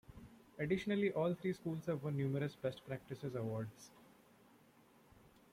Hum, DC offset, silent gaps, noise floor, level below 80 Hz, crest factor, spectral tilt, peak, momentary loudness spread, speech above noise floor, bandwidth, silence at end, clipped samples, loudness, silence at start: none; under 0.1%; none; -67 dBFS; -72 dBFS; 18 dB; -7.5 dB/octave; -24 dBFS; 22 LU; 27 dB; 16 kHz; 0.25 s; under 0.1%; -41 LUFS; 0.1 s